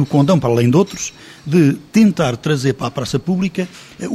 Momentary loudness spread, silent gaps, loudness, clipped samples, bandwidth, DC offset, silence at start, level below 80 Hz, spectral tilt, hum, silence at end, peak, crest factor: 12 LU; none; -16 LUFS; under 0.1%; 14.5 kHz; under 0.1%; 0 s; -48 dBFS; -6.5 dB/octave; none; 0 s; -2 dBFS; 14 dB